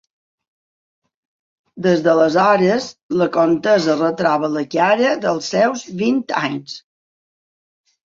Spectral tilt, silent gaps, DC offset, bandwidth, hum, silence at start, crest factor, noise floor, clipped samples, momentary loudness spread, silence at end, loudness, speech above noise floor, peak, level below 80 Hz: -5.5 dB/octave; 3.03-3.09 s; under 0.1%; 7.6 kHz; none; 1.75 s; 16 dB; under -90 dBFS; under 0.1%; 8 LU; 1.3 s; -17 LUFS; over 74 dB; -2 dBFS; -62 dBFS